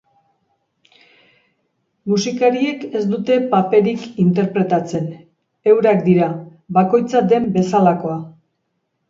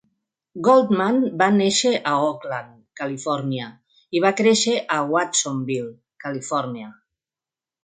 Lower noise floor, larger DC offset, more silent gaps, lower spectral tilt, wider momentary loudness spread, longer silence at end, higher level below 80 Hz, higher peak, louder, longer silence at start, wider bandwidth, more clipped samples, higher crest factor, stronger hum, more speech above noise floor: second, -71 dBFS vs under -90 dBFS; neither; neither; first, -7 dB/octave vs -4 dB/octave; second, 11 LU vs 15 LU; about the same, 0.8 s vs 0.9 s; first, -60 dBFS vs -70 dBFS; about the same, 0 dBFS vs -2 dBFS; first, -17 LUFS vs -21 LUFS; first, 2.05 s vs 0.55 s; second, 7.6 kHz vs 9.6 kHz; neither; about the same, 16 dB vs 20 dB; neither; second, 56 dB vs over 70 dB